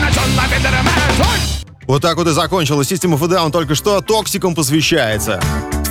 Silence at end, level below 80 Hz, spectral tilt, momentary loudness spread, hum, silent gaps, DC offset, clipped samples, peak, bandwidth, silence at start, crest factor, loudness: 0 s; -24 dBFS; -4.5 dB/octave; 5 LU; none; none; under 0.1%; under 0.1%; -4 dBFS; 18 kHz; 0 s; 12 dB; -15 LUFS